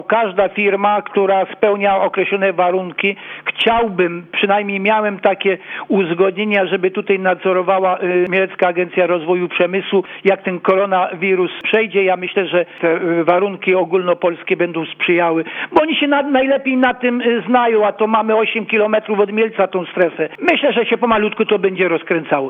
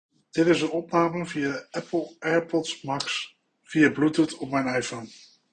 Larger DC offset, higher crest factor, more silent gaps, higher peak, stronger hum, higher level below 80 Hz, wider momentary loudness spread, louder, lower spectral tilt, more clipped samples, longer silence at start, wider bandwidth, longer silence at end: neither; about the same, 16 dB vs 20 dB; neither; first, 0 dBFS vs -8 dBFS; neither; first, -56 dBFS vs -66 dBFS; second, 4 LU vs 11 LU; first, -16 LUFS vs -26 LUFS; first, -8 dB/octave vs -5 dB/octave; neither; second, 0 s vs 0.35 s; second, 4.7 kHz vs 9.6 kHz; second, 0 s vs 0.35 s